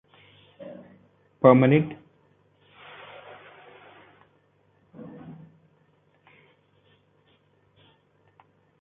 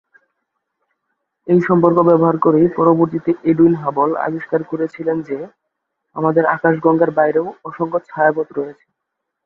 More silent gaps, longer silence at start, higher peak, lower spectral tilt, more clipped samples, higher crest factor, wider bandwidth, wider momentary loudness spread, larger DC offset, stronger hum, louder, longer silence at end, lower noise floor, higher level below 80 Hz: neither; second, 0.65 s vs 1.45 s; about the same, -2 dBFS vs -2 dBFS; second, -7.5 dB/octave vs -11 dB/octave; neither; first, 28 dB vs 16 dB; about the same, 3.9 kHz vs 4.2 kHz; first, 30 LU vs 13 LU; neither; neither; second, -20 LUFS vs -16 LUFS; first, 3.5 s vs 0.75 s; second, -64 dBFS vs -78 dBFS; second, -68 dBFS vs -60 dBFS